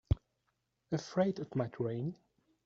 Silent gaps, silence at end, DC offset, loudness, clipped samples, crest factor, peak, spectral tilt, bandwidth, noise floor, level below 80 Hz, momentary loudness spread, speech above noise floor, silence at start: none; 0.5 s; under 0.1%; -37 LUFS; under 0.1%; 20 dB; -16 dBFS; -7.5 dB/octave; 7.8 kHz; -82 dBFS; -50 dBFS; 8 LU; 46 dB; 0.1 s